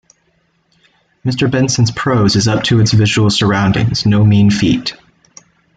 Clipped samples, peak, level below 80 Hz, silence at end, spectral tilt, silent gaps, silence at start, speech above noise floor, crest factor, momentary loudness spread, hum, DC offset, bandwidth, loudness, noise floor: under 0.1%; -2 dBFS; -40 dBFS; 0.85 s; -5.5 dB/octave; none; 1.25 s; 48 dB; 12 dB; 6 LU; none; under 0.1%; 9.2 kHz; -12 LUFS; -59 dBFS